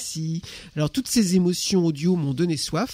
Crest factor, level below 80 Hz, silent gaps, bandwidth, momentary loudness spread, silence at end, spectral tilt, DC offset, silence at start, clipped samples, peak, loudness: 16 dB; -52 dBFS; none; 16 kHz; 9 LU; 0 s; -5 dB/octave; under 0.1%; 0 s; under 0.1%; -8 dBFS; -23 LUFS